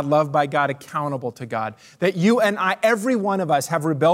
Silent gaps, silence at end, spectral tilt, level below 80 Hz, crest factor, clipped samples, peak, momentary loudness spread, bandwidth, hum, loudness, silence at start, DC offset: none; 0 s; -5.5 dB/octave; -72 dBFS; 14 dB; under 0.1%; -6 dBFS; 9 LU; 16 kHz; none; -21 LUFS; 0 s; under 0.1%